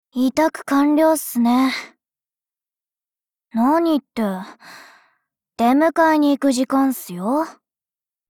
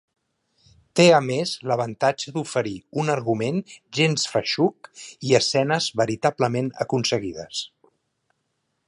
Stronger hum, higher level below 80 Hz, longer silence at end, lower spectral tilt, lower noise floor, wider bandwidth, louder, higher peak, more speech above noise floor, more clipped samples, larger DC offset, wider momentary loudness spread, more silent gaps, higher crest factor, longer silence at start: neither; about the same, -64 dBFS vs -64 dBFS; second, 0.75 s vs 1.2 s; about the same, -4.5 dB/octave vs -4.5 dB/octave; first, under -90 dBFS vs -75 dBFS; first, 18.5 kHz vs 11.5 kHz; first, -18 LUFS vs -23 LUFS; about the same, -6 dBFS vs -4 dBFS; first, over 72 dB vs 52 dB; neither; neither; about the same, 10 LU vs 12 LU; neither; second, 14 dB vs 20 dB; second, 0.15 s vs 0.95 s